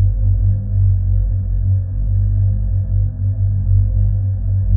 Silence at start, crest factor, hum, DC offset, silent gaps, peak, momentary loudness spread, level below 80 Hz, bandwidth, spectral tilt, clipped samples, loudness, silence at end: 0 s; 12 dB; none; under 0.1%; none; -4 dBFS; 3 LU; -20 dBFS; 0.9 kHz; -15 dB/octave; under 0.1%; -18 LUFS; 0 s